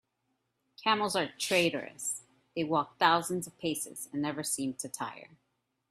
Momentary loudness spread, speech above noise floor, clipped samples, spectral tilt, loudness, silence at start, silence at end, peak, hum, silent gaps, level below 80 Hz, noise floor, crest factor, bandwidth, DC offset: 12 LU; 48 dB; under 0.1%; -3 dB/octave; -32 LUFS; 0.8 s; 0.65 s; -10 dBFS; none; none; -74 dBFS; -80 dBFS; 24 dB; 15.5 kHz; under 0.1%